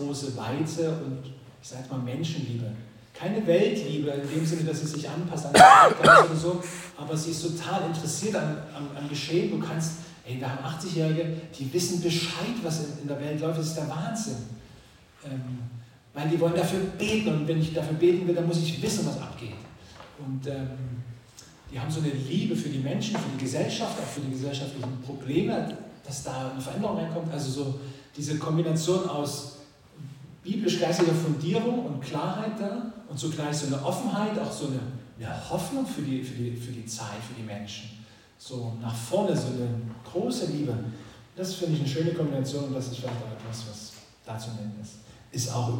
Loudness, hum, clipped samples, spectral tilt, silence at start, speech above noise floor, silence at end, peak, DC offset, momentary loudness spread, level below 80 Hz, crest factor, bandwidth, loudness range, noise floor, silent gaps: -27 LUFS; none; under 0.1%; -5 dB/octave; 0 s; 26 dB; 0 s; -2 dBFS; under 0.1%; 15 LU; -60 dBFS; 26 dB; 17 kHz; 14 LU; -53 dBFS; none